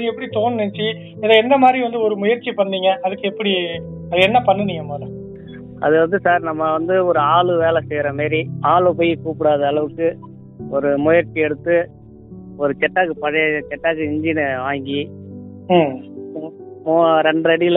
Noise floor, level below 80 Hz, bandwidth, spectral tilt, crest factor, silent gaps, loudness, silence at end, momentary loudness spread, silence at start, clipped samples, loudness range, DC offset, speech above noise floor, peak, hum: -38 dBFS; -54 dBFS; 4.1 kHz; -8 dB/octave; 18 dB; none; -17 LUFS; 0 s; 16 LU; 0 s; under 0.1%; 3 LU; under 0.1%; 21 dB; 0 dBFS; none